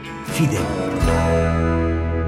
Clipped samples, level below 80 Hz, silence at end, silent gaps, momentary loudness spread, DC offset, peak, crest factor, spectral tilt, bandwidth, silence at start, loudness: under 0.1%; -30 dBFS; 0 s; none; 4 LU; under 0.1%; -6 dBFS; 14 dB; -6.5 dB/octave; 14.5 kHz; 0 s; -20 LUFS